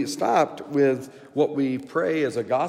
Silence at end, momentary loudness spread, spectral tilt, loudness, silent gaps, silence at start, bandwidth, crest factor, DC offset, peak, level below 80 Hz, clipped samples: 0 s; 4 LU; -5.5 dB/octave; -24 LUFS; none; 0 s; 15.5 kHz; 14 dB; under 0.1%; -8 dBFS; -76 dBFS; under 0.1%